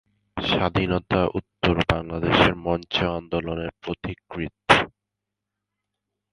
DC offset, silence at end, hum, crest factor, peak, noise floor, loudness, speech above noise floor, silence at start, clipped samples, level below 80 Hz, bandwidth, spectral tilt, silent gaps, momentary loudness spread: under 0.1%; 1.45 s; none; 24 dB; 0 dBFS; -84 dBFS; -23 LUFS; 61 dB; 0.35 s; under 0.1%; -42 dBFS; 11.5 kHz; -6 dB/octave; none; 14 LU